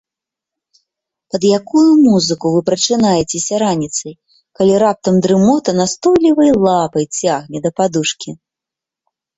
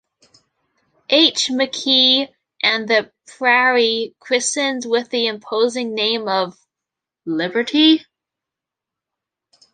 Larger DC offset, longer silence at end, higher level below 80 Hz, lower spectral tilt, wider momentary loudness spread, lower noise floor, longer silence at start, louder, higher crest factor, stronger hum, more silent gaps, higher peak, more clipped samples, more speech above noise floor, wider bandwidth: neither; second, 1.05 s vs 1.7 s; first, -52 dBFS vs -70 dBFS; first, -5 dB/octave vs -2 dB/octave; about the same, 9 LU vs 9 LU; about the same, -85 dBFS vs -85 dBFS; first, 1.35 s vs 1.1 s; first, -13 LUFS vs -17 LUFS; about the same, 14 dB vs 18 dB; neither; neither; about the same, -2 dBFS vs -2 dBFS; neither; first, 72 dB vs 68 dB; second, 8.2 kHz vs 9.6 kHz